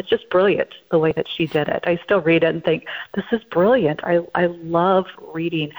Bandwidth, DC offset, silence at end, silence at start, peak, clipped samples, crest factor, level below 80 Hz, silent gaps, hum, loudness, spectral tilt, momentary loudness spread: over 20 kHz; under 0.1%; 0 s; 0 s; -6 dBFS; under 0.1%; 14 dB; -56 dBFS; none; none; -20 LUFS; -8 dB/octave; 8 LU